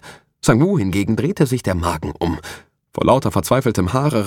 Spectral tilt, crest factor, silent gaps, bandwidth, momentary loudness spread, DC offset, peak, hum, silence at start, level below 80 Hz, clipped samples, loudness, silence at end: -6.5 dB/octave; 16 dB; none; 17.5 kHz; 10 LU; under 0.1%; -2 dBFS; none; 0.05 s; -40 dBFS; under 0.1%; -18 LUFS; 0 s